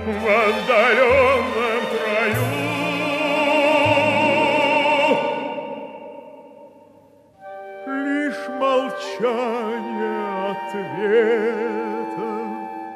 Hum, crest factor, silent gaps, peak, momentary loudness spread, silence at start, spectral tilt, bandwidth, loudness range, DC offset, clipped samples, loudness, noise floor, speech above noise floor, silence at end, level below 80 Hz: none; 16 dB; none; -4 dBFS; 14 LU; 0 s; -5 dB/octave; 15 kHz; 8 LU; under 0.1%; under 0.1%; -20 LUFS; -51 dBFS; 34 dB; 0 s; -54 dBFS